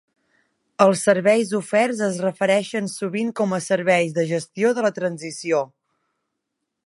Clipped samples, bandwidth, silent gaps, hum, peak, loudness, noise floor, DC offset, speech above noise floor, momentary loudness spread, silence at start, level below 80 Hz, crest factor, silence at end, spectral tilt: under 0.1%; 11.5 kHz; none; none; 0 dBFS; -21 LUFS; -79 dBFS; under 0.1%; 59 dB; 9 LU; 0.8 s; -72 dBFS; 20 dB; 1.2 s; -5 dB/octave